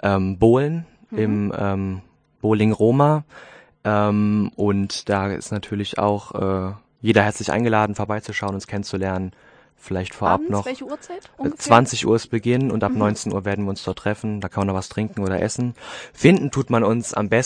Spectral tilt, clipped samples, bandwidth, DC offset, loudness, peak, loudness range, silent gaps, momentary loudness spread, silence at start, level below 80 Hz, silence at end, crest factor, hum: -6 dB/octave; under 0.1%; 9.8 kHz; under 0.1%; -21 LUFS; 0 dBFS; 4 LU; none; 12 LU; 0 s; -50 dBFS; 0 s; 20 dB; none